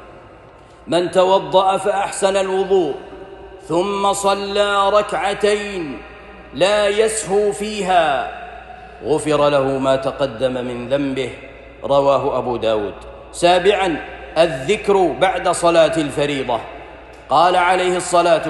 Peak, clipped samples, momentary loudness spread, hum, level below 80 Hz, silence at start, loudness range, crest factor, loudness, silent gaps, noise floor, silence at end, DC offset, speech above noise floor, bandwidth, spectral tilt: -2 dBFS; under 0.1%; 18 LU; none; -46 dBFS; 0 s; 3 LU; 16 dB; -17 LUFS; none; -43 dBFS; 0 s; under 0.1%; 26 dB; 12.5 kHz; -4 dB/octave